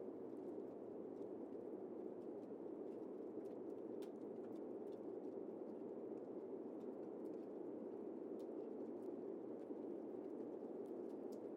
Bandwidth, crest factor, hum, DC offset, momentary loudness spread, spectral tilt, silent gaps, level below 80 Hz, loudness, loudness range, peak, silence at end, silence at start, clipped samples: 11.5 kHz; 14 dB; none; under 0.1%; 2 LU; -8.5 dB/octave; none; under -90 dBFS; -51 LUFS; 1 LU; -38 dBFS; 0 s; 0 s; under 0.1%